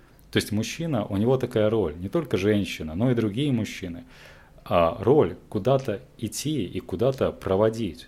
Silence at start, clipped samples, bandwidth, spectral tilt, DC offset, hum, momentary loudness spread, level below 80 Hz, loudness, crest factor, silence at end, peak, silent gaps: 0.3 s; under 0.1%; 16 kHz; -6 dB/octave; under 0.1%; none; 10 LU; -52 dBFS; -25 LUFS; 18 dB; 0 s; -6 dBFS; none